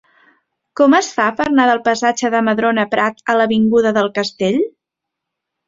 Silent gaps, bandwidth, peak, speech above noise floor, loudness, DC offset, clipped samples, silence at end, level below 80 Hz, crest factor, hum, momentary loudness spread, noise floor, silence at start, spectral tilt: none; 7.8 kHz; -2 dBFS; 67 dB; -15 LUFS; under 0.1%; under 0.1%; 1 s; -56 dBFS; 14 dB; none; 6 LU; -81 dBFS; 0.75 s; -4.5 dB/octave